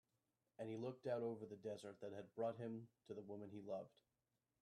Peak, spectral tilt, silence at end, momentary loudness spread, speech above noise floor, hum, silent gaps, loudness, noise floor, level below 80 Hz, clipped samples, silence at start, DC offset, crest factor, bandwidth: -34 dBFS; -7.5 dB/octave; 0.75 s; 9 LU; over 40 dB; none; none; -51 LUFS; under -90 dBFS; under -90 dBFS; under 0.1%; 0.6 s; under 0.1%; 18 dB; 12 kHz